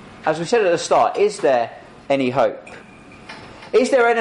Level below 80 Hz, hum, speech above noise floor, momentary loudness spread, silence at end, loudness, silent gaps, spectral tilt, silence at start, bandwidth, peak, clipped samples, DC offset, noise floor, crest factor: -58 dBFS; none; 23 dB; 21 LU; 0 s; -18 LUFS; none; -4.5 dB/octave; 0 s; 11 kHz; -4 dBFS; under 0.1%; under 0.1%; -41 dBFS; 14 dB